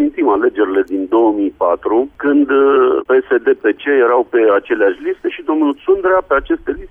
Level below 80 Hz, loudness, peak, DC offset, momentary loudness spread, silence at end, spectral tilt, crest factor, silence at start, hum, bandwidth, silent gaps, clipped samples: -44 dBFS; -14 LUFS; -4 dBFS; under 0.1%; 5 LU; 0.05 s; -7.5 dB/octave; 10 dB; 0 s; none; 3.6 kHz; none; under 0.1%